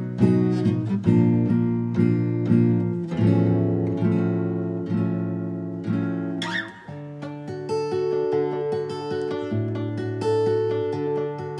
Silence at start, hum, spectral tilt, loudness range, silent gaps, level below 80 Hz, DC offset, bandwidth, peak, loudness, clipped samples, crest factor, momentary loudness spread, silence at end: 0 s; none; -9 dB/octave; 6 LU; none; -54 dBFS; under 0.1%; 9.8 kHz; -6 dBFS; -23 LUFS; under 0.1%; 16 dB; 9 LU; 0 s